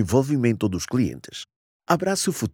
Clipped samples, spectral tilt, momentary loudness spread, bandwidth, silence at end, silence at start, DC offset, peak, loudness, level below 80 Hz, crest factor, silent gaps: under 0.1%; -5.5 dB/octave; 16 LU; 19 kHz; 0.05 s; 0 s; under 0.1%; -4 dBFS; -23 LUFS; -52 dBFS; 20 dB; 1.56-1.80 s